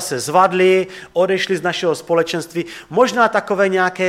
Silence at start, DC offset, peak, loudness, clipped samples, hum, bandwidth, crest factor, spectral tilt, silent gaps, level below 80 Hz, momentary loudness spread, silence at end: 0 s; under 0.1%; -2 dBFS; -17 LUFS; under 0.1%; none; 15.5 kHz; 16 dB; -4.5 dB/octave; none; -58 dBFS; 9 LU; 0 s